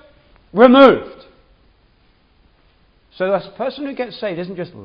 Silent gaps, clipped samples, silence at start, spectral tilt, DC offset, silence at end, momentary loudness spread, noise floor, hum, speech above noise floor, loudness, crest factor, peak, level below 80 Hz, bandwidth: none; under 0.1%; 0.55 s; -7.5 dB/octave; under 0.1%; 0 s; 18 LU; -55 dBFS; none; 41 dB; -15 LUFS; 18 dB; 0 dBFS; -54 dBFS; 5.4 kHz